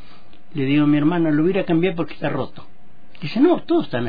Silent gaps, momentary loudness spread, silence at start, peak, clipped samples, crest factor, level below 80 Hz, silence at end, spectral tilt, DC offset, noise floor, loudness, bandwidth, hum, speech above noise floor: none; 11 LU; 0.55 s; -6 dBFS; under 0.1%; 14 dB; -56 dBFS; 0 s; -10 dB/octave; 4%; -49 dBFS; -19 LUFS; 5 kHz; none; 30 dB